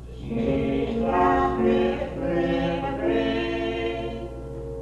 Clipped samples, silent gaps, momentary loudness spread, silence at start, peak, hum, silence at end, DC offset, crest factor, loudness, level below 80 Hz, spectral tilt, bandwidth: under 0.1%; none; 11 LU; 0 s; -10 dBFS; none; 0 s; under 0.1%; 14 dB; -24 LUFS; -38 dBFS; -7.5 dB/octave; 9.4 kHz